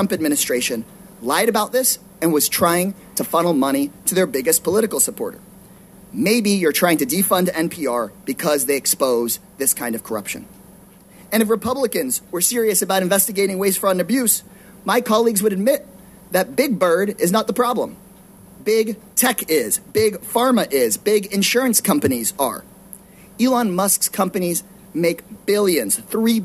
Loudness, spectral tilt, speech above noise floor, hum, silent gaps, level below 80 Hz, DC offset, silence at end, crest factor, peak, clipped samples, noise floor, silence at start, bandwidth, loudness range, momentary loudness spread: -18 LUFS; -3.5 dB/octave; 27 dB; none; none; -58 dBFS; under 0.1%; 0 s; 18 dB; -2 dBFS; under 0.1%; -45 dBFS; 0 s; 16 kHz; 3 LU; 8 LU